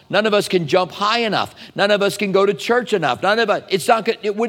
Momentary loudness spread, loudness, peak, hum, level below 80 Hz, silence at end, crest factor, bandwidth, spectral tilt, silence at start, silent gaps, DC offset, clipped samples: 4 LU; -18 LUFS; 0 dBFS; none; -64 dBFS; 0 s; 18 dB; 16.5 kHz; -4 dB/octave; 0.1 s; none; under 0.1%; under 0.1%